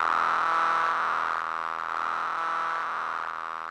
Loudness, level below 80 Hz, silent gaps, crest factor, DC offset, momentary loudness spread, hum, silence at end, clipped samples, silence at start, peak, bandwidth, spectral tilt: -27 LUFS; -70 dBFS; none; 14 dB; under 0.1%; 7 LU; none; 0 s; under 0.1%; 0 s; -14 dBFS; 11.5 kHz; -2 dB/octave